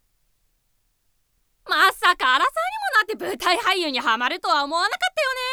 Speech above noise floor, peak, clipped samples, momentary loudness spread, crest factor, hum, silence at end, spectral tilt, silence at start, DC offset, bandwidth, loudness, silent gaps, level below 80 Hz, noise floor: 46 dB; -6 dBFS; under 0.1%; 6 LU; 16 dB; none; 0 s; -0.5 dB/octave; 1.65 s; under 0.1%; over 20 kHz; -20 LUFS; none; -60 dBFS; -68 dBFS